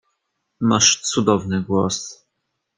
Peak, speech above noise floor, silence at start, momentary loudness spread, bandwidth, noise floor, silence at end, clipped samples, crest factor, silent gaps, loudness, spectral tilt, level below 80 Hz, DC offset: -2 dBFS; 57 dB; 0.6 s; 10 LU; 11 kHz; -76 dBFS; 0.65 s; under 0.1%; 20 dB; none; -18 LUFS; -3.5 dB/octave; -58 dBFS; under 0.1%